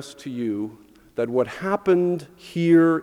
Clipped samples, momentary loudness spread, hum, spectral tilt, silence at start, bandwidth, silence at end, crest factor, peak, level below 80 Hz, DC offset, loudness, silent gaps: under 0.1%; 16 LU; none; -7.5 dB/octave; 0 s; 11.5 kHz; 0 s; 16 dB; -6 dBFS; -62 dBFS; under 0.1%; -22 LUFS; none